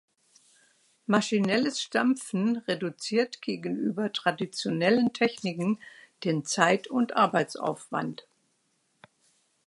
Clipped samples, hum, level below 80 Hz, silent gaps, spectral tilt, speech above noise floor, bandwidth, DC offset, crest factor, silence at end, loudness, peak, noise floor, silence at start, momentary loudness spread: under 0.1%; none; -78 dBFS; none; -4.5 dB/octave; 45 dB; 11.5 kHz; under 0.1%; 24 dB; 1.55 s; -28 LUFS; -4 dBFS; -73 dBFS; 1.1 s; 9 LU